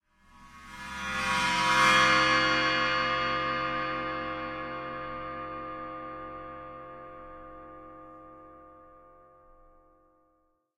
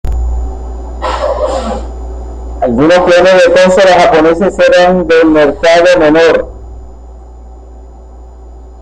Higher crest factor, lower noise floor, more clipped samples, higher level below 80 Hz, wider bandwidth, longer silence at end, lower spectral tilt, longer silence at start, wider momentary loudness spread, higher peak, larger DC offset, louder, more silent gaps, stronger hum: first, 22 dB vs 8 dB; first, -72 dBFS vs -30 dBFS; neither; second, -54 dBFS vs -22 dBFS; first, 16 kHz vs 9.8 kHz; first, 1.8 s vs 0 s; second, -2.5 dB/octave vs -5.5 dB/octave; first, 0.4 s vs 0.05 s; first, 25 LU vs 18 LU; second, -10 dBFS vs 0 dBFS; neither; second, -27 LUFS vs -7 LUFS; neither; neither